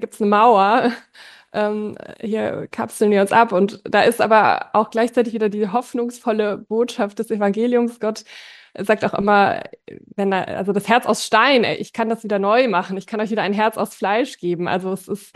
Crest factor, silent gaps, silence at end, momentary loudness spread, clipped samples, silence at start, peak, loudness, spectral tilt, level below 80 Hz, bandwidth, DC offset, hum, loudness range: 16 dB; none; 0.1 s; 12 LU; under 0.1%; 0 s; -2 dBFS; -19 LUFS; -5 dB/octave; -64 dBFS; 12.5 kHz; under 0.1%; none; 4 LU